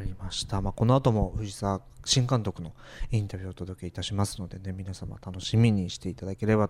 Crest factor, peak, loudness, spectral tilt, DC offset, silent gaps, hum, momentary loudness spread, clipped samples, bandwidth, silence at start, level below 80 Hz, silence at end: 18 dB; -10 dBFS; -29 LUFS; -5.5 dB/octave; under 0.1%; none; none; 15 LU; under 0.1%; 13.5 kHz; 0 s; -42 dBFS; 0 s